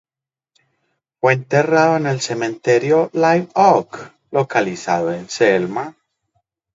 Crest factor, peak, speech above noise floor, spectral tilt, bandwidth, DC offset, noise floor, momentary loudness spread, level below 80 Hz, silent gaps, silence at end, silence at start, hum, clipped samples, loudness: 18 dB; 0 dBFS; 73 dB; -5.5 dB/octave; 7.8 kHz; under 0.1%; -90 dBFS; 9 LU; -64 dBFS; none; 0.85 s; 1.25 s; none; under 0.1%; -17 LUFS